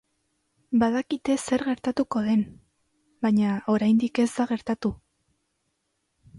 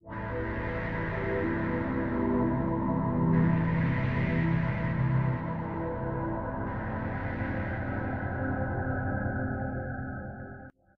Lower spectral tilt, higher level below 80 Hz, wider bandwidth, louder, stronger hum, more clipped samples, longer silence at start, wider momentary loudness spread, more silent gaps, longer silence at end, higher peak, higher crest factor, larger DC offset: second, -6 dB/octave vs -10.5 dB/octave; second, -58 dBFS vs -44 dBFS; first, 11.5 kHz vs 4.9 kHz; first, -25 LUFS vs -31 LUFS; neither; neither; first, 0.7 s vs 0.05 s; about the same, 7 LU vs 7 LU; neither; second, 0 s vs 0.3 s; about the same, -12 dBFS vs -14 dBFS; about the same, 14 dB vs 16 dB; neither